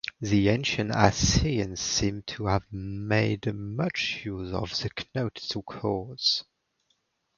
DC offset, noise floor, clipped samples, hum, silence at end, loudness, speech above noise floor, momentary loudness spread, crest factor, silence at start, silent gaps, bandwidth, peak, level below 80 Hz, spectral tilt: under 0.1%; -74 dBFS; under 0.1%; none; 0.95 s; -27 LUFS; 46 dB; 9 LU; 26 dB; 0.05 s; none; 7.4 kHz; -2 dBFS; -42 dBFS; -4.5 dB/octave